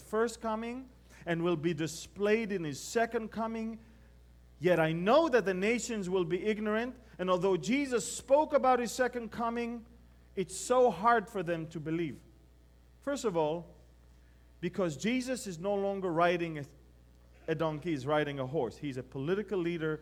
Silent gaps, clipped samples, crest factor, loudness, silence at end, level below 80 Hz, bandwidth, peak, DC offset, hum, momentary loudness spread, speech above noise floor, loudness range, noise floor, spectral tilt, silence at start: none; under 0.1%; 20 dB; -32 LUFS; 0 s; -60 dBFS; 16 kHz; -14 dBFS; under 0.1%; none; 12 LU; 28 dB; 5 LU; -60 dBFS; -5 dB/octave; 0 s